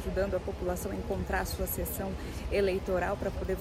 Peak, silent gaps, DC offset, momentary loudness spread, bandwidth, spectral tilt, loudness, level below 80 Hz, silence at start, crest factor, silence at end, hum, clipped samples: -18 dBFS; none; under 0.1%; 6 LU; 16.5 kHz; -5.5 dB/octave; -33 LUFS; -40 dBFS; 0 s; 14 dB; 0 s; none; under 0.1%